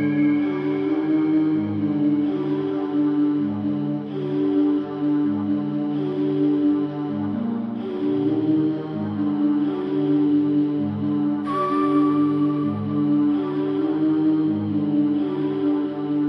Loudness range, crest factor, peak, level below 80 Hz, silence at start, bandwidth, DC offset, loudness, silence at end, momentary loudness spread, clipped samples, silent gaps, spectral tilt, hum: 2 LU; 12 dB; -10 dBFS; -66 dBFS; 0 s; 5 kHz; under 0.1%; -22 LUFS; 0 s; 5 LU; under 0.1%; none; -10 dB/octave; none